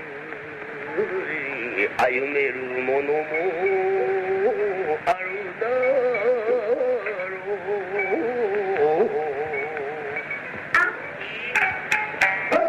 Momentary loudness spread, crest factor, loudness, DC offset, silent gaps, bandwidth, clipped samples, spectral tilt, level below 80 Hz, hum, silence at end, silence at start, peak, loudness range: 9 LU; 20 dB; -24 LUFS; under 0.1%; none; 14.5 kHz; under 0.1%; -5 dB/octave; -64 dBFS; none; 0 s; 0 s; -4 dBFS; 2 LU